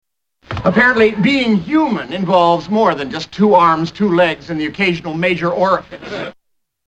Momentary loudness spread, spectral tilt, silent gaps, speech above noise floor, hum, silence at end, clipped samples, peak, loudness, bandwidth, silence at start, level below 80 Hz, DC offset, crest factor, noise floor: 13 LU; -6.5 dB/octave; none; 20 dB; none; 0.6 s; under 0.1%; 0 dBFS; -14 LUFS; 8.8 kHz; 0.5 s; -46 dBFS; under 0.1%; 14 dB; -34 dBFS